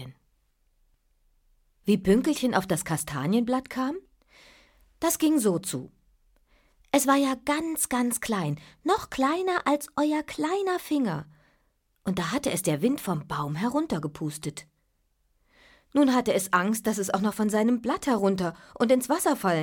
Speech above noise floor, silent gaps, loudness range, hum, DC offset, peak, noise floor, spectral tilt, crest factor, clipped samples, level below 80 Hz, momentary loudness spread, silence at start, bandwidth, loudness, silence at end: 46 dB; none; 4 LU; none; under 0.1%; -8 dBFS; -72 dBFS; -4.5 dB/octave; 20 dB; under 0.1%; -58 dBFS; 10 LU; 0 s; 17.5 kHz; -26 LUFS; 0 s